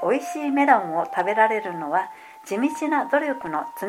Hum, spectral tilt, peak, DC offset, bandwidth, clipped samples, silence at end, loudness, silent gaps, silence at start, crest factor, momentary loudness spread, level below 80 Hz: none; -5 dB/octave; -4 dBFS; under 0.1%; 16 kHz; under 0.1%; 0 s; -23 LUFS; none; 0 s; 20 dB; 10 LU; -72 dBFS